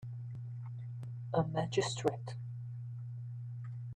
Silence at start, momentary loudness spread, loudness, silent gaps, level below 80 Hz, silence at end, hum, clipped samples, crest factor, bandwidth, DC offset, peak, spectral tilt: 0 s; 10 LU; -39 LUFS; none; -68 dBFS; 0 s; none; under 0.1%; 22 dB; 10 kHz; under 0.1%; -16 dBFS; -6 dB/octave